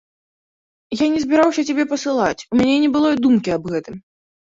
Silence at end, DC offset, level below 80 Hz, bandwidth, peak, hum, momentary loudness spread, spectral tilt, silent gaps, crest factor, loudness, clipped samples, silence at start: 0.5 s; under 0.1%; -54 dBFS; 7.8 kHz; -4 dBFS; none; 11 LU; -5 dB/octave; none; 16 dB; -18 LUFS; under 0.1%; 0.9 s